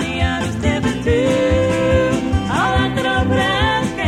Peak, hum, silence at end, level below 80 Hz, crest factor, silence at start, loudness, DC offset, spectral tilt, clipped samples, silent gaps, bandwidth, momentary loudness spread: -4 dBFS; none; 0 s; -28 dBFS; 12 dB; 0 s; -17 LUFS; under 0.1%; -5.5 dB/octave; under 0.1%; none; 12.5 kHz; 3 LU